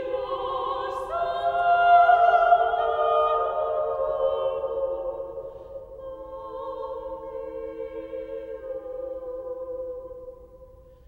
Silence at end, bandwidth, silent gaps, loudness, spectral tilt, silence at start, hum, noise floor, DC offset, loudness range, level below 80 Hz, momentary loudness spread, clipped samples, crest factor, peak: 0.25 s; 4.5 kHz; none; -25 LUFS; -5.5 dB/octave; 0 s; none; -49 dBFS; under 0.1%; 15 LU; -54 dBFS; 20 LU; under 0.1%; 18 dB; -6 dBFS